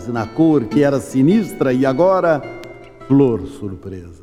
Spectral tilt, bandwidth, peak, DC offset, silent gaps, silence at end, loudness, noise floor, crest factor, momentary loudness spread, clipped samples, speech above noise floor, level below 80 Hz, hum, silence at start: -8 dB/octave; 13.5 kHz; -2 dBFS; under 0.1%; none; 0.1 s; -16 LUFS; -36 dBFS; 16 dB; 18 LU; under 0.1%; 20 dB; -46 dBFS; none; 0 s